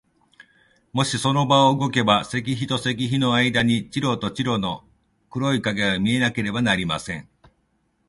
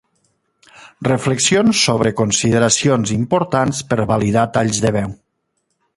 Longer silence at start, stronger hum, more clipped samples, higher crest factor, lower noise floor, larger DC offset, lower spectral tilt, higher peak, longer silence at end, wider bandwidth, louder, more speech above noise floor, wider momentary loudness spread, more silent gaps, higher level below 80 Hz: second, 0.4 s vs 0.8 s; neither; neither; about the same, 20 dB vs 16 dB; about the same, -68 dBFS vs -70 dBFS; neither; about the same, -5 dB/octave vs -4.5 dB/octave; second, -4 dBFS vs 0 dBFS; about the same, 0.85 s vs 0.85 s; about the same, 11.5 kHz vs 11.5 kHz; second, -21 LUFS vs -16 LUFS; second, 46 dB vs 54 dB; first, 9 LU vs 6 LU; neither; second, -52 dBFS vs -46 dBFS